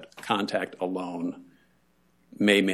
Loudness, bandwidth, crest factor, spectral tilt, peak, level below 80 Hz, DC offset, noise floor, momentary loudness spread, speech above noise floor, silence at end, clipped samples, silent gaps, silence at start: -28 LUFS; 13.5 kHz; 22 dB; -4.5 dB/octave; -8 dBFS; -74 dBFS; under 0.1%; -66 dBFS; 13 LU; 40 dB; 0 s; under 0.1%; none; 0 s